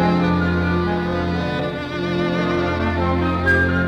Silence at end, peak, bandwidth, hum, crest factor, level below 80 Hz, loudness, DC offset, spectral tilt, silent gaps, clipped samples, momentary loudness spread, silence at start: 0 s; -6 dBFS; 8 kHz; none; 14 dB; -34 dBFS; -20 LUFS; under 0.1%; -7.5 dB/octave; none; under 0.1%; 6 LU; 0 s